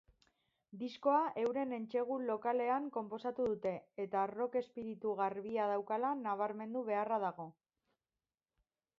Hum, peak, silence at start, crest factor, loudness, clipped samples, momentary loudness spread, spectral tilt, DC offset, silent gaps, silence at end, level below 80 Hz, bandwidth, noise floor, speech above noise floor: none; -20 dBFS; 0.75 s; 18 dB; -38 LUFS; under 0.1%; 8 LU; -5 dB/octave; under 0.1%; none; 1.45 s; -80 dBFS; 7.2 kHz; under -90 dBFS; over 53 dB